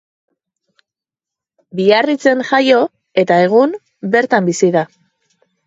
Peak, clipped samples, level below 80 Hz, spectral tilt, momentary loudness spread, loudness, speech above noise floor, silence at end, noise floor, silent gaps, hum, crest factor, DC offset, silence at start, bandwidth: 0 dBFS; under 0.1%; -66 dBFS; -5 dB/octave; 7 LU; -13 LUFS; 74 dB; 0.8 s; -86 dBFS; none; none; 16 dB; under 0.1%; 1.75 s; 8 kHz